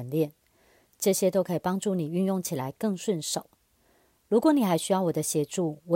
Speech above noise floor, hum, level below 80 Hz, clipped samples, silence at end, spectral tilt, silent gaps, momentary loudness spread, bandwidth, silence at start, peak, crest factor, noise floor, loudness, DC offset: 39 dB; none; -70 dBFS; under 0.1%; 0 s; -5.5 dB/octave; none; 8 LU; 16.5 kHz; 0 s; -10 dBFS; 16 dB; -66 dBFS; -27 LUFS; under 0.1%